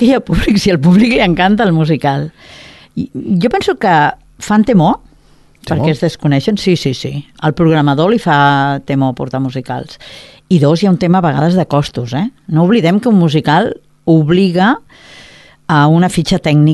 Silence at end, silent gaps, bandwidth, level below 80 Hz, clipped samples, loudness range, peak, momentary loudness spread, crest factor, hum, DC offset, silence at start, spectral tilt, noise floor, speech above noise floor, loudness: 0 s; none; 12.5 kHz; -36 dBFS; under 0.1%; 2 LU; 0 dBFS; 12 LU; 12 dB; none; under 0.1%; 0 s; -7 dB/octave; -45 dBFS; 34 dB; -12 LUFS